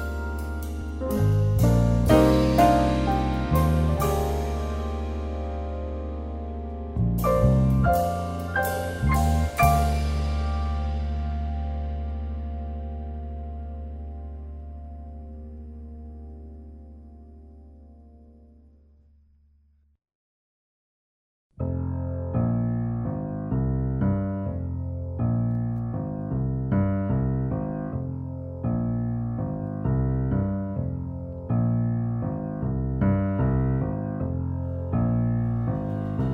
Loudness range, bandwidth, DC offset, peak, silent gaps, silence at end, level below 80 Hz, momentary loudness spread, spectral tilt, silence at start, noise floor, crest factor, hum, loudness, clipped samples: 17 LU; 16 kHz; under 0.1%; -4 dBFS; 20.15-21.50 s; 0 s; -32 dBFS; 16 LU; -8 dB/octave; 0 s; -62 dBFS; 20 dB; none; -26 LUFS; under 0.1%